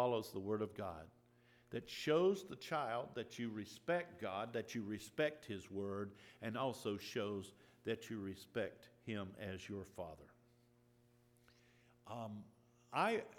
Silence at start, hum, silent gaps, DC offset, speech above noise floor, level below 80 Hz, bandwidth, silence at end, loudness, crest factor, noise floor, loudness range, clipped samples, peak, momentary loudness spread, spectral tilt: 0 s; none; none; under 0.1%; 29 dB; -80 dBFS; 19 kHz; 0 s; -44 LUFS; 22 dB; -72 dBFS; 11 LU; under 0.1%; -22 dBFS; 13 LU; -5.5 dB/octave